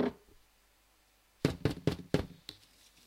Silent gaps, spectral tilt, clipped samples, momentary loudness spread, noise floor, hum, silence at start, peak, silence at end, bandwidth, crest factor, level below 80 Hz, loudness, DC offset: none; -6.5 dB/octave; under 0.1%; 20 LU; -68 dBFS; 50 Hz at -60 dBFS; 0 s; -12 dBFS; 0.55 s; 16 kHz; 26 dB; -56 dBFS; -36 LUFS; under 0.1%